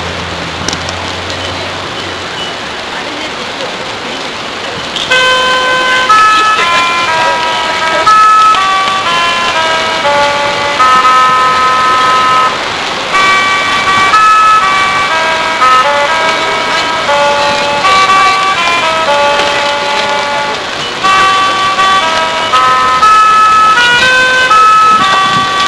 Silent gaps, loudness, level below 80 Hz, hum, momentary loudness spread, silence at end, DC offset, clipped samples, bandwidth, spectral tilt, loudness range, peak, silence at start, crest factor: none; -8 LUFS; -40 dBFS; none; 12 LU; 0 s; under 0.1%; 0.7%; 11 kHz; -1.5 dB/octave; 8 LU; 0 dBFS; 0 s; 8 dB